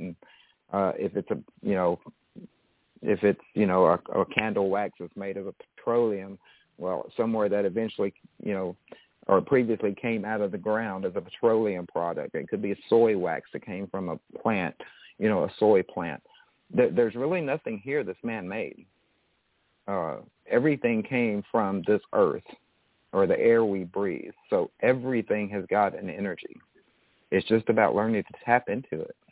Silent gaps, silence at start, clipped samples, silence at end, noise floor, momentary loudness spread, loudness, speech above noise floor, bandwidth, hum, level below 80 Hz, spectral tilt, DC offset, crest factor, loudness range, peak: none; 0 s; under 0.1%; 0.2 s; -71 dBFS; 13 LU; -27 LUFS; 45 dB; 4 kHz; none; -64 dBFS; -10.5 dB/octave; under 0.1%; 20 dB; 3 LU; -8 dBFS